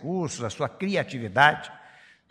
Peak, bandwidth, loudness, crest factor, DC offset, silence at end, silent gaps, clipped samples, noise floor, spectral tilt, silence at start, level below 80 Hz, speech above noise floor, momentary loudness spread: -2 dBFS; 15.5 kHz; -25 LUFS; 24 dB; under 0.1%; 0.5 s; none; under 0.1%; -53 dBFS; -4.5 dB/octave; 0 s; -64 dBFS; 28 dB; 13 LU